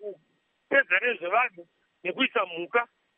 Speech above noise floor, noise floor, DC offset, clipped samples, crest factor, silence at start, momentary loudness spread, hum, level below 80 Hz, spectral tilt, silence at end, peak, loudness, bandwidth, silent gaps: 43 dB; -71 dBFS; under 0.1%; under 0.1%; 20 dB; 0 s; 11 LU; none; -88 dBFS; 0.5 dB/octave; 0.35 s; -10 dBFS; -26 LUFS; 3.9 kHz; none